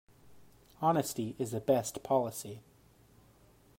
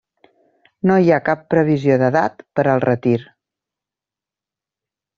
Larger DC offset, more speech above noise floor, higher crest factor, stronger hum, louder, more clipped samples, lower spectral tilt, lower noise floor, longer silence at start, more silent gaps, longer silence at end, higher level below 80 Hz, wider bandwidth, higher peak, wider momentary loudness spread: neither; second, 30 dB vs 72 dB; about the same, 20 dB vs 16 dB; neither; second, -33 LUFS vs -17 LUFS; neither; second, -5.5 dB/octave vs -7.5 dB/octave; second, -63 dBFS vs -88 dBFS; second, 0.25 s vs 0.85 s; neither; second, 1.2 s vs 1.95 s; second, -70 dBFS vs -58 dBFS; first, 16 kHz vs 7.2 kHz; second, -14 dBFS vs -2 dBFS; first, 13 LU vs 6 LU